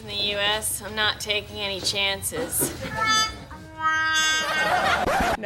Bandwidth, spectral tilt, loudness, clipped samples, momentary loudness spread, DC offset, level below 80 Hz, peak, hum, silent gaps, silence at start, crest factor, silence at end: 17 kHz; -1.5 dB/octave; -23 LUFS; under 0.1%; 7 LU; under 0.1%; -44 dBFS; -8 dBFS; none; none; 0 s; 18 dB; 0 s